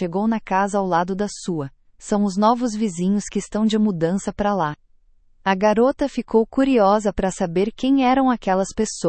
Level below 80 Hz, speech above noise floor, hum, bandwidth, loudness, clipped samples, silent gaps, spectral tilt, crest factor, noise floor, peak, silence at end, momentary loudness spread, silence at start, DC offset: -46 dBFS; 35 dB; none; 8.8 kHz; -20 LUFS; under 0.1%; none; -5.5 dB/octave; 16 dB; -54 dBFS; -4 dBFS; 0 s; 9 LU; 0 s; under 0.1%